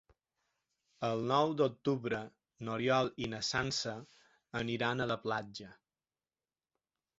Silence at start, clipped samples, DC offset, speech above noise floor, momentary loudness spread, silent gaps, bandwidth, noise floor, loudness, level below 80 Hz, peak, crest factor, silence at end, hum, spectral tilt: 1 s; under 0.1%; under 0.1%; over 55 dB; 15 LU; none; 8 kHz; under -90 dBFS; -35 LUFS; -68 dBFS; -16 dBFS; 22 dB; 1.45 s; none; -3.5 dB/octave